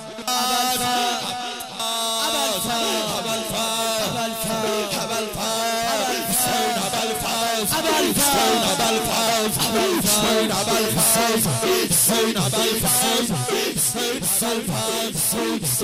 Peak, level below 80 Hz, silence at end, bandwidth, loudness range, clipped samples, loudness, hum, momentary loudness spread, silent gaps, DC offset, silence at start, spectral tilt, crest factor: -8 dBFS; -48 dBFS; 0 s; 16 kHz; 4 LU; under 0.1%; -20 LUFS; none; 7 LU; none; under 0.1%; 0 s; -2.5 dB/octave; 14 dB